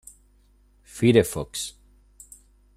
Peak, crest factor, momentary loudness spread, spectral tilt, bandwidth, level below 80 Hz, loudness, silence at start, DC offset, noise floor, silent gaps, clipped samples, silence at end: -4 dBFS; 22 dB; 16 LU; -5.5 dB/octave; 15 kHz; -52 dBFS; -23 LUFS; 0.95 s; under 0.1%; -59 dBFS; none; under 0.1%; 1.05 s